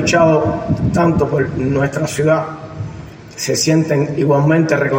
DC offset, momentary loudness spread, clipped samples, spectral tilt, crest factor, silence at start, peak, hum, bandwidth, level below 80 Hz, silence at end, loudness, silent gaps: under 0.1%; 15 LU; under 0.1%; -5.5 dB/octave; 14 dB; 0 s; -2 dBFS; none; 16.5 kHz; -40 dBFS; 0 s; -15 LUFS; none